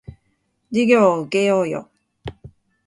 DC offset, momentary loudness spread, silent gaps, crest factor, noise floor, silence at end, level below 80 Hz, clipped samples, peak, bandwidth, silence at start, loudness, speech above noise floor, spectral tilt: under 0.1%; 22 LU; none; 18 dB; -68 dBFS; 0.4 s; -52 dBFS; under 0.1%; -2 dBFS; 11 kHz; 0.1 s; -18 LUFS; 51 dB; -6 dB/octave